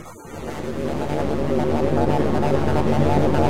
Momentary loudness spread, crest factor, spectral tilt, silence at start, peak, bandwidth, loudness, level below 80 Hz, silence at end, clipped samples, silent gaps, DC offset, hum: 12 LU; 16 dB; -7.5 dB/octave; 0 s; -4 dBFS; 15.5 kHz; -22 LUFS; -36 dBFS; 0 s; under 0.1%; none; 4%; none